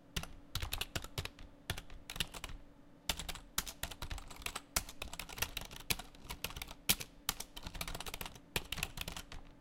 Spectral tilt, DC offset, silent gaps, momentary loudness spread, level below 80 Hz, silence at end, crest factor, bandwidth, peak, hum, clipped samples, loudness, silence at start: -2 dB/octave; under 0.1%; none; 9 LU; -50 dBFS; 0 s; 30 dB; 17 kHz; -12 dBFS; none; under 0.1%; -42 LUFS; 0 s